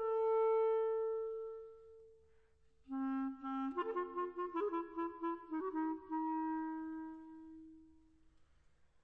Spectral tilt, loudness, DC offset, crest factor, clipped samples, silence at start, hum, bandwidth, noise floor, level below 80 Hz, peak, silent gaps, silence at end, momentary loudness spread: -7.5 dB/octave; -40 LUFS; under 0.1%; 14 dB; under 0.1%; 0 s; 50 Hz at -90 dBFS; 3.9 kHz; -73 dBFS; -76 dBFS; -28 dBFS; none; 1.15 s; 20 LU